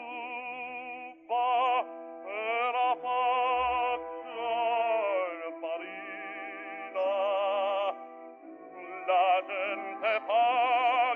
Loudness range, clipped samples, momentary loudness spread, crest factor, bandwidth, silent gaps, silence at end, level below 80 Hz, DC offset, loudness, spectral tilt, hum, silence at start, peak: 4 LU; under 0.1%; 15 LU; 14 dB; 4.3 kHz; none; 0 s; -68 dBFS; under 0.1%; -30 LUFS; 1 dB/octave; none; 0 s; -16 dBFS